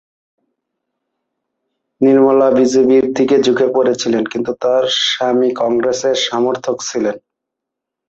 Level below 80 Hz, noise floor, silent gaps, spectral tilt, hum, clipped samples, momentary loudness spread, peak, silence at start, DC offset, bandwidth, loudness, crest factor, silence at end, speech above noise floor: -58 dBFS; -81 dBFS; none; -4 dB/octave; none; under 0.1%; 9 LU; -2 dBFS; 2 s; under 0.1%; 8 kHz; -14 LUFS; 14 dB; 0.9 s; 67 dB